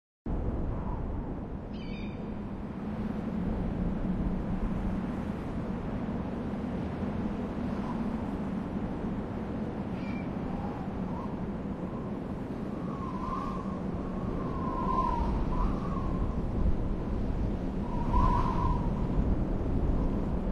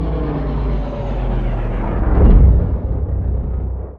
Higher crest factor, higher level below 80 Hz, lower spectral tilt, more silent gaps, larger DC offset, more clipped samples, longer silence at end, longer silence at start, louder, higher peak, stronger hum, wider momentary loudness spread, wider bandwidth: about the same, 18 dB vs 14 dB; second, -36 dBFS vs -16 dBFS; second, -9 dB/octave vs -11 dB/octave; neither; neither; neither; about the same, 0 s vs 0 s; first, 0.25 s vs 0 s; second, -34 LUFS vs -18 LUFS; second, -14 dBFS vs 0 dBFS; neither; second, 6 LU vs 11 LU; first, 7.2 kHz vs 4.2 kHz